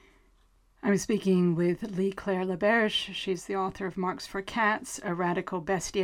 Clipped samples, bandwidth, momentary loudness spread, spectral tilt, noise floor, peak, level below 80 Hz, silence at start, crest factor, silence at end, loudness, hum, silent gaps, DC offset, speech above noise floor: under 0.1%; 15 kHz; 8 LU; -5 dB/octave; -64 dBFS; -12 dBFS; -58 dBFS; 0.85 s; 16 dB; 0 s; -29 LUFS; none; none; under 0.1%; 35 dB